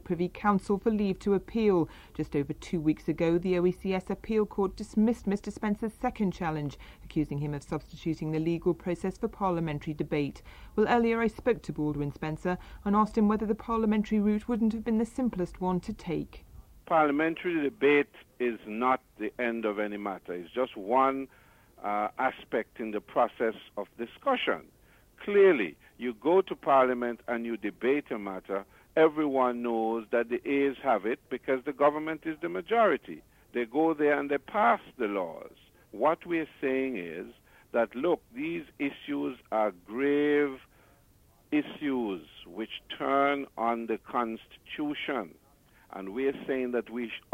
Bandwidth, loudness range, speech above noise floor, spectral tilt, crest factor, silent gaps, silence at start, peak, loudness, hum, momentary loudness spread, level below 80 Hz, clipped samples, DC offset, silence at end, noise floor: 16 kHz; 4 LU; 33 dB; -7 dB/octave; 18 dB; none; 0.05 s; -12 dBFS; -30 LUFS; none; 11 LU; -54 dBFS; under 0.1%; under 0.1%; 0.15 s; -62 dBFS